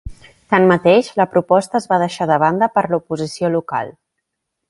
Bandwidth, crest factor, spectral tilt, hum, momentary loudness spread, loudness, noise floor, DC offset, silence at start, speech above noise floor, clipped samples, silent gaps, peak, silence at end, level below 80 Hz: 11.5 kHz; 16 dB; -6 dB/octave; none; 9 LU; -16 LUFS; -77 dBFS; under 0.1%; 0.05 s; 61 dB; under 0.1%; none; 0 dBFS; 0.8 s; -46 dBFS